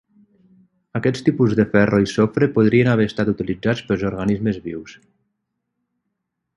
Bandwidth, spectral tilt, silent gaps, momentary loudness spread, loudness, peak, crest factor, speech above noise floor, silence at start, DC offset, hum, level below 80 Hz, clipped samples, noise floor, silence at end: 11 kHz; -7.5 dB/octave; none; 8 LU; -19 LUFS; -2 dBFS; 18 dB; 59 dB; 0.95 s; under 0.1%; none; -48 dBFS; under 0.1%; -77 dBFS; 1.65 s